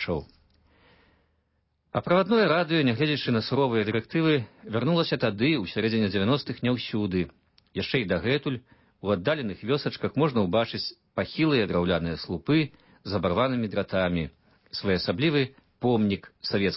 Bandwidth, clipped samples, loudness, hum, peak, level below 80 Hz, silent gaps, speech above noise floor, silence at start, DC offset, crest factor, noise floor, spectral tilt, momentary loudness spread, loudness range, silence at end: 5.8 kHz; under 0.1%; -26 LUFS; none; -10 dBFS; -50 dBFS; none; 47 dB; 0 s; under 0.1%; 16 dB; -72 dBFS; -10 dB/octave; 9 LU; 3 LU; 0 s